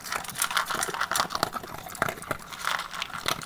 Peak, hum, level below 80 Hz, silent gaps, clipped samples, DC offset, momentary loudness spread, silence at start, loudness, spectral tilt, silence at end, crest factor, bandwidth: -4 dBFS; none; -56 dBFS; none; under 0.1%; under 0.1%; 9 LU; 0 s; -29 LUFS; -1.5 dB/octave; 0 s; 28 dB; over 20 kHz